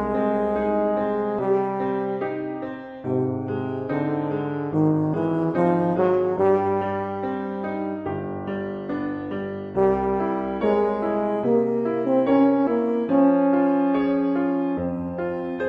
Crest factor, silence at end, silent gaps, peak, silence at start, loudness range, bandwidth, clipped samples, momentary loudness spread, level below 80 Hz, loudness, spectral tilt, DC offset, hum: 14 dB; 0 s; none; -8 dBFS; 0 s; 6 LU; 5.2 kHz; under 0.1%; 10 LU; -52 dBFS; -23 LUFS; -10 dB/octave; under 0.1%; none